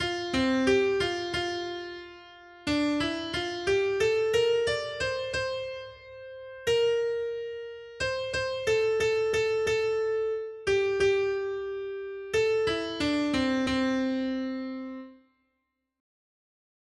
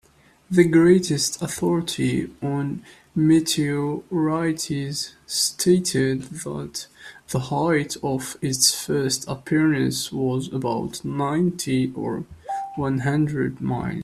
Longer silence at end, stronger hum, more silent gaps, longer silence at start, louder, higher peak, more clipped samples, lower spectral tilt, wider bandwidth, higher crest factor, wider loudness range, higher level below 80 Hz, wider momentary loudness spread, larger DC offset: first, 1.85 s vs 0 s; neither; neither; second, 0 s vs 0.5 s; second, -28 LUFS vs -22 LUFS; second, -12 dBFS vs -2 dBFS; neither; about the same, -4.5 dB/octave vs -4.5 dB/octave; second, 12.5 kHz vs 14.5 kHz; about the same, 16 dB vs 20 dB; about the same, 4 LU vs 3 LU; about the same, -56 dBFS vs -54 dBFS; about the same, 13 LU vs 12 LU; neither